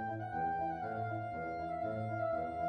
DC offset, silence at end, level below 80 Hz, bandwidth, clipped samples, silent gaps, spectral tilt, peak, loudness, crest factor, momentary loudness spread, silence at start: under 0.1%; 0 s; -62 dBFS; 8.8 kHz; under 0.1%; none; -9 dB/octave; -26 dBFS; -39 LUFS; 12 dB; 4 LU; 0 s